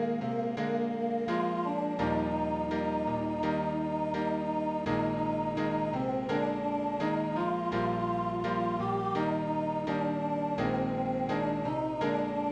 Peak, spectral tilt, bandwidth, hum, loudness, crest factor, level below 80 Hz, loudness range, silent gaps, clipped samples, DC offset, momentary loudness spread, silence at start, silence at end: -18 dBFS; -8 dB/octave; 9.2 kHz; none; -31 LUFS; 14 dB; -56 dBFS; 0 LU; none; under 0.1%; under 0.1%; 2 LU; 0 s; 0 s